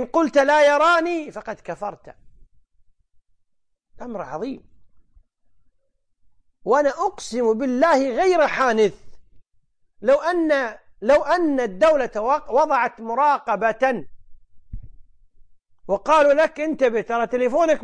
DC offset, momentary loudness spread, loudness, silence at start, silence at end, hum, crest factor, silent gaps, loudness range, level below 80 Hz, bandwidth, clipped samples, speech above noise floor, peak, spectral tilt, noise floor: under 0.1%; 15 LU; -20 LUFS; 0 s; 0 s; none; 16 dB; none; 18 LU; -50 dBFS; 10 kHz; under 0.1%; 50 dB; -6 dBFS; -4.5 dB/octave; -70 dBFS